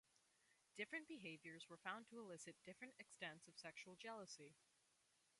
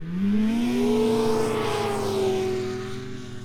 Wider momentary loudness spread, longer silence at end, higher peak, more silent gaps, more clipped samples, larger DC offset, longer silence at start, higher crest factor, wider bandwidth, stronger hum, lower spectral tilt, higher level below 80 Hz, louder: second, 8 LU vs 11 LU; first, 0.75 s vs 0 s; second, -34 dBFS vs -12 dBFS; neither; neither; neither; first, 0.15 s vs 0 s; first, 24 dB vs 12 dB; second, 11.5 kHz vs 18 kHz; neither; second, -3 dB/octave vs -6 dB/octave; second, under -90 dBFS vs -48 dBFS; second, -56 LUFS vs -24 LUFS